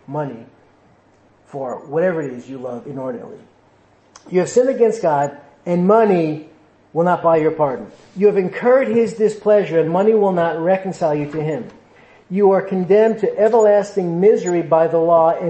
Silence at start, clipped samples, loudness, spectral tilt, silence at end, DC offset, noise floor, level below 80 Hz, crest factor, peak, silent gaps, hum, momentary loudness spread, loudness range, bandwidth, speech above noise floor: 0.1 s; under 0.1%; -17 LUFS; -7 dB/octave; 0 s; under 0.1%; -53 dBFS; -62 dBFS; 14 dB; -2 dBFS; none; none; 15 LU; 10 LU; 8.6 kHz; 37 dB